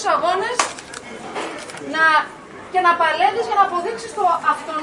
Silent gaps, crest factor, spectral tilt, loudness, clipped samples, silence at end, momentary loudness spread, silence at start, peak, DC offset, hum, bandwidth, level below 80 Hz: none; 18 dB; -2 dB/octave; -19 LUFS; under 0.1%; 0 s; 16 LU; 0 s; -2 dBFS; under 0.1%; none; 11 kHz; -60 dBFS